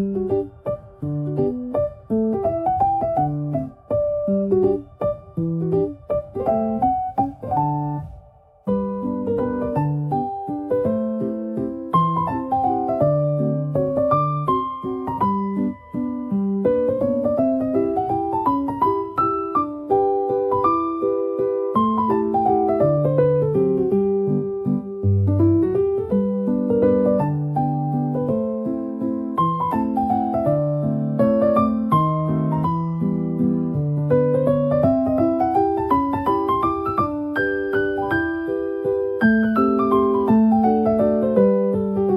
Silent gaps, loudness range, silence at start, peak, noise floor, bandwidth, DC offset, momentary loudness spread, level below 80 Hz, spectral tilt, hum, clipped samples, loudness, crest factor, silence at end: none; 4 LU; 0 s; -4 dBFS; -48 dBFS; 12.5 kHz; under 0.1%; 8 LU; -48 dBFS; -10.5 dB/octave; none; under 0.1%; -21 LUFS; 16 dB; 0 s